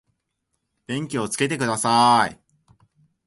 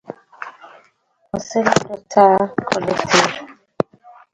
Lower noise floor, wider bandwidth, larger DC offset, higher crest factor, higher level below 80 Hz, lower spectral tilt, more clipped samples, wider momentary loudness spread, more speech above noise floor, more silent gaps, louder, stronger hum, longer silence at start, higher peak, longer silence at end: first, -76 dBFS vs -60 dBFS; first, 12 kHz vs 9.6 kHz; neither; about the same, 18 dB vs 20 dB; second, -62 dBFS vs -54 dBFS; about the same, -3.5 dB/octave vs -4 dB/octave; neither; second, 12 LU vs 21 LU; first, 56 dB vs 44 dB; neither; second, -21 LUFS vs -17 LUFS; neither; first, 0.9 s vs 0.1 s; second, -4 dBFS vs 0 dBFS; first, 0.95 s vs 0.8 s